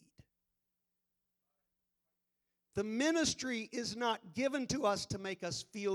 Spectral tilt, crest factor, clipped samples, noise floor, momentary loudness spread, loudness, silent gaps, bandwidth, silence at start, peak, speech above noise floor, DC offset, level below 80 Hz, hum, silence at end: -3.5 dB/octave; 20 dB; under 0.1%; -87 dBFS; 8 LU; -36 LUFS; none; 19.5 kHz; 2.75 s; -20 dBFS; 50 dB; under 0.1%; -70 dBFS; none; 0 s